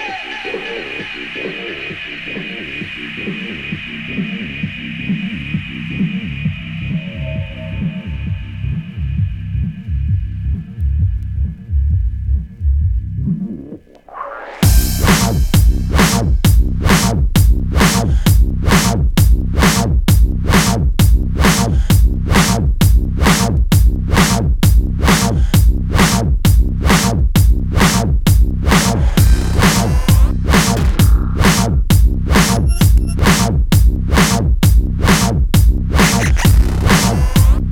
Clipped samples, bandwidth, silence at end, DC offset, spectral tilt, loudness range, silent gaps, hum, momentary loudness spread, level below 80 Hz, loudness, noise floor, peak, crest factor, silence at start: under 0.1%; 18 kHz; 0 s; under 0.1%; -5 dB/octave; 10 LU; none; none; 11 LU; -16 dBFS; -15 LUFS; -35 dBFS; 0 dBFS; 12 dB; 0 s